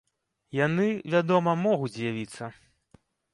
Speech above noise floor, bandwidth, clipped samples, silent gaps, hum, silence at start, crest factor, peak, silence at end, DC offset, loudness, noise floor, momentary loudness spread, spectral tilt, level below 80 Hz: 36 dB; 11.5 kHz; under 0.1%; none; none; 0.55 s; 18 dB; -10 dBFS; 0.8 s; under 0.1%; -26 LUFS; -62 dBFS; 14 LU; -7 dB/octave; -68 dBFS